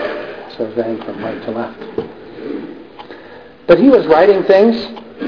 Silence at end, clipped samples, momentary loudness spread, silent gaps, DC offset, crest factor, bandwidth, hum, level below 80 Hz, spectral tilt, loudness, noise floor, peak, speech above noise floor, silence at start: 0 s; under 0.1%; 24 LU; none; 0.3%; 14 dB; 5.4 kHz; none; -48 dBFS; -8 dB/octave; -13 LUFS; -37 dBFS; 0 dBFS; 25 dB; 0 s